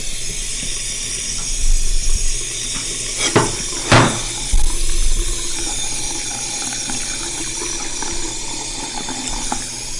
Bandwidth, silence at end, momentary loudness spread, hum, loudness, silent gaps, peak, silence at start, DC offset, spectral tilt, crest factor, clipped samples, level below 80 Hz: 11.5 kHz; 0 s; 8 LU; none; -20 LUFS; none; -4 dBFS; 0 s; under 0.1%; -2.5 dB/octave; 14 dB; under 0.1%; -22 dBFS